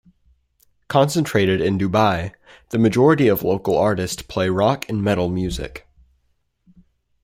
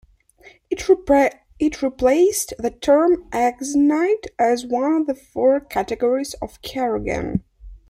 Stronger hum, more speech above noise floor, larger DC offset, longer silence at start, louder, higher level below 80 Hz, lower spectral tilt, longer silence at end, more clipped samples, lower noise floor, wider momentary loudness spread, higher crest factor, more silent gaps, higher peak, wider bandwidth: neither; first, 48 dB vs 31 dB; neither; first, 0.9 s vs 0.45 s; about the same, -19 LUFS vs -20 LUFS; about the same, -44 dBFS vs -44 dBFS; first, -6 dB/octave vs -4.5 dB/octave; first, 1.45 s vs 0.15 s; neither; first, -67 dBFS vs -50 dBFS; about the same, 11 LU vs 10 LU; about the same, 18 dB vs 16 dB; neither; about the same, -2 dBFS vs -4 dBFS; about the same, 16 kHz vs 15.5 kHz